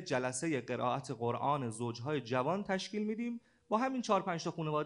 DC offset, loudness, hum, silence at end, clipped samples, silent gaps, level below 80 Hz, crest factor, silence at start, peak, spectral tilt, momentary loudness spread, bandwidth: under 0.1%; -36 LUFS; none; 0 s; under 0.1%; none; -76 dBFS; 20 dB; 0 s; -16 dBFS; -5 dB/octave; 6 LU; 10.5 kHz